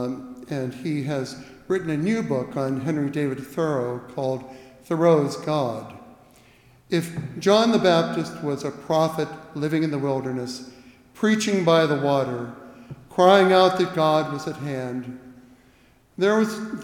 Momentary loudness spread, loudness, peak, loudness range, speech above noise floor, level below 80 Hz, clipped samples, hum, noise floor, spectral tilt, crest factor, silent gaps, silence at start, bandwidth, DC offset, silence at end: 15 LU; -23 LUFS; -4 dBFS; 6 LU; 34 dB; -62 dBFS; under 0.1%; none; -57 dBFS; -6 dB/octave; 20 dB; none; 0 s; 17 kHz; under 0.1%; 0 s